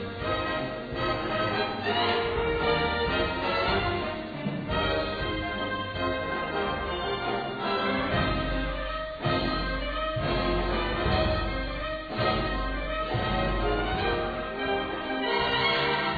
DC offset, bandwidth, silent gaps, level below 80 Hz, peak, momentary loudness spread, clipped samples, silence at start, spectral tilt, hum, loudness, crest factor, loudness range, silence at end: under 0.1%; 4.9 kHz; none; -38 dBFS; -12 dBFS; 6 LU; under 0.1%; 0 s; -7.5 dB/octave; none; -28 LUFS; 16 dB; 2 LU; 0 s